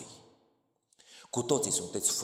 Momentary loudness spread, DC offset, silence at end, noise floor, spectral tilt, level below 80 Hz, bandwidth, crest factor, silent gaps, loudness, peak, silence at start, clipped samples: 10 LU; under 0.1%; 0 s; -73 dBFS; -3 dB/octave; -72 dBFS; 17 kHz; 22 dB; none; -30 LUFS; -14 dBFS; 0 s; under 0.1%